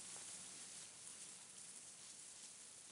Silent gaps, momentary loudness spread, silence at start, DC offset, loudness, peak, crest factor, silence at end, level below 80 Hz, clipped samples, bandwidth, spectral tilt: none; 4 LU; 0 s; under 0.1%; -53 LUFS; -38 dBFS; 20 dB; 0 s; under -90 dBFS; under 0.1%; 15.5 kHz; 0 dB/octave